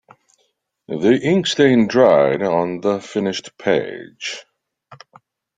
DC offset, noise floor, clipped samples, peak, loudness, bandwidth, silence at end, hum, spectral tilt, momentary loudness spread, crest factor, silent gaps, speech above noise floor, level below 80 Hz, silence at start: under 0.1%; -67 dBFS; under 0.1%; -2 dBFS; -17 LUFS; 9.4 kHz; 0.65 s; none; -5.5 dB/octave; 15 LU; 18 dB; none; 50 dB; -60 dBFS; 0.9 s